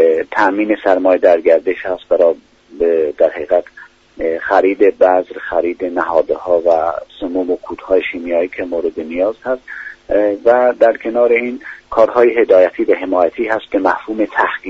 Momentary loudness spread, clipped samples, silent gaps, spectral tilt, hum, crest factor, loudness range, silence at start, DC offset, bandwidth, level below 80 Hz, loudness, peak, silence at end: 10 LU; under 0.1%; none; -6 dB/octave; none; 14 dB; 4 LU; 0 s; under 0.1%; 7.2 kHz; -50 dBFS; -15 LUFS; 0 dBFS; 0 s